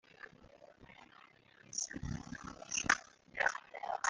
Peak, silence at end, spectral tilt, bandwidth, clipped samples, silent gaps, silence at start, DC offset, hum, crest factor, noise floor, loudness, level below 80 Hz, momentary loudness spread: -14 dBFS; 0 s; -2 dB/octave; 10 kHz; under 0.1%; none; 0.1 s; under 0.1%; none; 28 dB; -63 dBFS; -38 LUFS; -62 dBFS; 25 LU